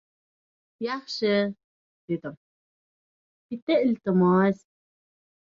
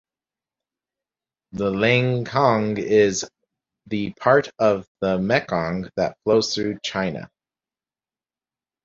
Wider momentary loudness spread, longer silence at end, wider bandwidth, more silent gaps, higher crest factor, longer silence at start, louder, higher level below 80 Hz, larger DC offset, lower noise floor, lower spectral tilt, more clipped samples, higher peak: first, 15 LU vs 10 LU; second, 0.95 s vs 1.6 s; about the same, 7.4 kHz vs 7.8 kHz; first, 1.64-2.08 s, 2.37-3.49 s, 3.62-3.67 s vs 4.88-4.95 s; about the same, 16 dB vs 20 dB; second, 0.8 s vs 1.55 s; second, -25 LUFS vs -21 LUFS; second, -70 dBFS vs -54 dBFS; neither; about the same, under -90 dBFS vs under -90 dBFS; first, -7.5 dB/octave vs -5 dB/octave; neither; second, -12 dBFS vs -2 dBFS